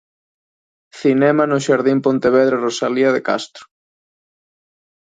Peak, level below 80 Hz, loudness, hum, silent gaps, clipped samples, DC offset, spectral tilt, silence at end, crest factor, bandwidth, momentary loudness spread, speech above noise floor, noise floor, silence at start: -2 dBFS; -62 dBFS; -16 LUFS; none; none; under 0.1%; under 0.1%; -5.5 dB/octave; 1.4 s; 16 dB; 9.2 kHz; 7 LU; over 74 dB; under -90 dBFS; 0.95 s